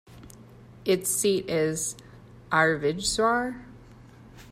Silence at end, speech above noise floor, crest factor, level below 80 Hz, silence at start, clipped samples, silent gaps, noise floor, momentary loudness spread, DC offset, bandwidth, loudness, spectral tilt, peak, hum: 0 s; 24 dB; 20 dB; -54 dBFS; 0.1 s; under 0.1%; none; -49 dBFS; 11 LU; under 0.1%; 16 kHz; -25 LUFS; -3.5 dB/octave; -8 dBFS; none